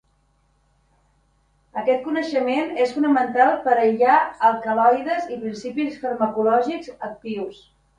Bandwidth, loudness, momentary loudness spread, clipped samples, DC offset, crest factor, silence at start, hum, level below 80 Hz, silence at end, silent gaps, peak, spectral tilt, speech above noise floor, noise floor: 10 kHz; -21 LUFS; 13 LU; under 0.1%; under 0.1%; 18 dB; 1.75 s; none; -64 dBFS; 0.45 s; none; -4 dBFS; -5.5 dB/octave; 43 dB; -63 dBFS